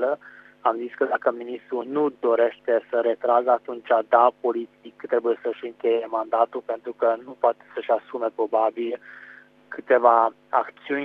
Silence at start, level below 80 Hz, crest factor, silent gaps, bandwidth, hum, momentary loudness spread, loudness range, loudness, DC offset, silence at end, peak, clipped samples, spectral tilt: 0 s; -80 dBFS; 20 dB; none; 4.7 kHz; 50 Hz at -70 dBFS; 13 LU; 3 LU; -23 LUFS; under 0.1%; 0 s; -4 dBFS; under 0.1%; -7 dB/octave